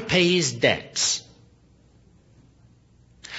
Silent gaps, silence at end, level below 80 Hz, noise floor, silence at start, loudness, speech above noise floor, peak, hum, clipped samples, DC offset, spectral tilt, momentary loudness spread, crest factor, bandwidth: none; 0 s; -56 dBFS; -56 dBFS; 0 s; -21 LUFS; 34 dB; -6 dBFS; none; under 0.1%; under 0.1%; -3 dB/octave; 4 LU; 22 dB; 8 kHz